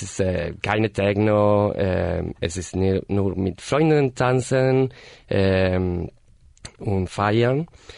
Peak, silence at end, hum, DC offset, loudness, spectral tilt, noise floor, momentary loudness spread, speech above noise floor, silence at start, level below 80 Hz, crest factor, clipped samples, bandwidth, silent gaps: -6 dBFS; 0 s; none; under 0.1%; -22 LUFS; -6.5 dB/octave; -45 dBFS; 8 LU; 24 dB; 0 s; -44 dBFS; 16 dB; under 0.1%; 11 kHz; none